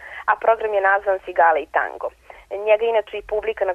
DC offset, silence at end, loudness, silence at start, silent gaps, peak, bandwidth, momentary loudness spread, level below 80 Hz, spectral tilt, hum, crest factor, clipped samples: under 0.1%; 0 s; -20 LUFS; 0 s; none; -4 dBFS; 5.2 kHz; 10 LU; -54 dBFS; -4.5 dB/octave; none; 16 dB; under 0.1%